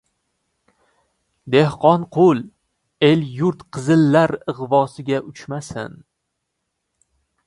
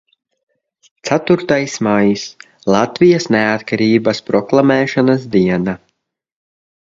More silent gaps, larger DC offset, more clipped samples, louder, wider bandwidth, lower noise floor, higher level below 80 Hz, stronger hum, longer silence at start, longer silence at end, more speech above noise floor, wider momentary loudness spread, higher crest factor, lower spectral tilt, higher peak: neither; neither; neither; second, -18 LUFS vs -14 LUFS; first, 11.5 kHz vs 7.8 kHz; first, -76 dBFS vs -69 dBFS; second, -58 dBFS vs -52 dBFS; neither; first, 1.45 s vs 1.05 s; first, 1.6 s vs 1.15 s; first, 59 dB vs 55 dB; first, 16 LU vs 10 LU; about the same, 20 dB vs 16 dB; about the same, -7 dB/octave vs -6 dB/octave; about the same, 0 dBFS vs 0 dBFS